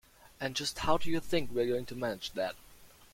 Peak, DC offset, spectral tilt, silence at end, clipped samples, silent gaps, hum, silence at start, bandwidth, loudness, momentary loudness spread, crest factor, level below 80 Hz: -12 dBFS; under 0.1%; -4 dB/octave; 0.25 s; under 0.1%; none; none; 0.4 s; 16.5 kHz; -34 LUFS; 7 LU; 20 dB; -54 dBFS